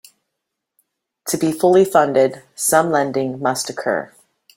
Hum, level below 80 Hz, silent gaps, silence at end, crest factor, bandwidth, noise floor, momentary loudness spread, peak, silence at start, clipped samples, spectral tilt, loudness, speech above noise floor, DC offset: none; -62 dBFS; none; 0.5 s; 18 dB; 17 kHz; -79 dBFS; 11 LU; -2 dBFS; 1.25 s; under 0.1%; -4 dB/octave; -17 LUFS; 62 dB; under 0.1%